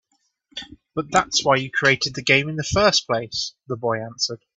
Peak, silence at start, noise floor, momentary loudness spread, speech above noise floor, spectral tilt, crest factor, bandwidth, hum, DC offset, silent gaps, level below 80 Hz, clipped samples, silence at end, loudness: 0 dBFS; 0.55 s; -70 dBFS; 14 LU; 48 dB; -3 dB/octave; 22 dB; 8.4 kHz; none; under 0.1%; none; -50 dBFS; under 0.1%; 0.2 s; -20 LUFS